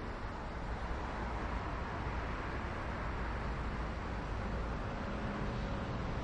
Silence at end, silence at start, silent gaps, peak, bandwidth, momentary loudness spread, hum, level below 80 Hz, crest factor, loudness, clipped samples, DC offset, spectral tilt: 0 s; 0 s; none; -26 dBFS; 8.8 kHz; 2 LU; none; -42 dBFS; 14 dB; -40 LUFS; under 0.1%; under 0.1%; -7 dB/octave